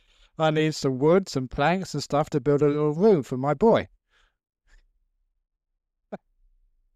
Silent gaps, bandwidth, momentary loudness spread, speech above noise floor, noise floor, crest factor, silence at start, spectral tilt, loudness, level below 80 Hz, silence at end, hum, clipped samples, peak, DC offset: none; 12.5 kHz; 19 LU; 49 dB; -72 dBFS; 16 dB; 0.4 s; -6.5 dB/octave; -23 LUFS; -54 dBFS; 0.8 s; none; under 0.1%; -8 dBFS; under 0.1%